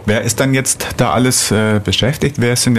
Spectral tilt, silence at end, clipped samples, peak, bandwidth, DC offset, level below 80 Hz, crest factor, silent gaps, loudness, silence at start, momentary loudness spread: -4 dB/octave; 0 s; under 0.1%; -2 dBFS; 14 kHz; under 0.1%; -38 dBFS; 12 dB; none; -14 LUFS; 0 s; 4 LU